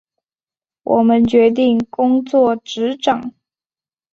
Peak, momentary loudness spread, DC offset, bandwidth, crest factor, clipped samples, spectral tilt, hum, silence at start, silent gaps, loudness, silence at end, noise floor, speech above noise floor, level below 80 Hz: -2 dBFS; 9 LU; under 0.1%; 7.4 kHz; 14 dB; under 0.1%; -6 dB/octave; none; 0.85 s; none; -15 LUFS; 0.85 s; under -90 dBFS; over 76 dB; -52 dBFS